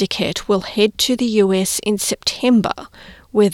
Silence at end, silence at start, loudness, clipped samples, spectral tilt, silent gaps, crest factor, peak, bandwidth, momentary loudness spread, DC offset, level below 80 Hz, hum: 0 s; 0 s; -17 LUFS; under 0.1%; -4 dB/octave; none; 14 dB; -2 dBFS; 17 kHz; 5 LU; under 0.1%; -48 dBFS; none